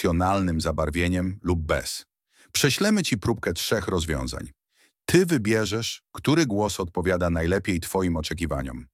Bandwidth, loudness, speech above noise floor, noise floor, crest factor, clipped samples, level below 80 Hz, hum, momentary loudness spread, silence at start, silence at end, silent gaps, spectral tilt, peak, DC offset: 16.5 kHz; -25 LUFS; 41 dB; -66 dBFS; 20 dB; under 0.1%; -40 dBFS; none; 8 LU; 0 s; 0.1 s; none; -5 dB/octave; -6 dBFS; under 0.1%